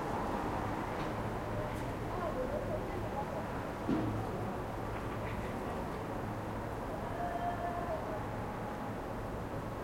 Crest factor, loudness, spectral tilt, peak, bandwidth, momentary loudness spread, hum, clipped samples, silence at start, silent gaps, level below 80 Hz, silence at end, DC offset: 16 dB; -39 LUFS; -7 dB/octave; -22 dBFS; 16.5 kHz; 4 LU; none; under 0.1%; 0 s; none; -48 dBFS; 0 s; under 0.1%